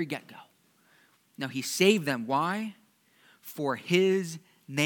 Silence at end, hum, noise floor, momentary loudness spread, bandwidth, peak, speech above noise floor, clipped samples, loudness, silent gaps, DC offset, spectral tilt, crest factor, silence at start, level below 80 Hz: 0 s; none; -65 dBFS; 17 LU; 19 kHz; -8 dBFS; 37 dB; under 0.1%; -28 LUFS; none; under 0.1%; -4.5 dB/octave; 22 dB; 0 s; -88 dBFS